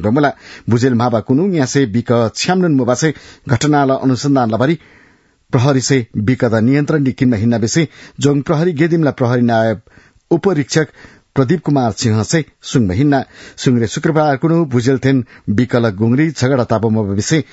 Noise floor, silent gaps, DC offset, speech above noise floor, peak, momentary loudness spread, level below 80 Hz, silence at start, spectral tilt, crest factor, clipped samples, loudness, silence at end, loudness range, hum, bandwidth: -51 dBFS; none; under 0.1%; 37 dB; 0 dBFS; 5 LU; -50 dBFS; 0 s; -6 dB/octave; 14 dB; under 0.1%; -15 LUFS; 0.1 s; 1 LU; none; 8 kHz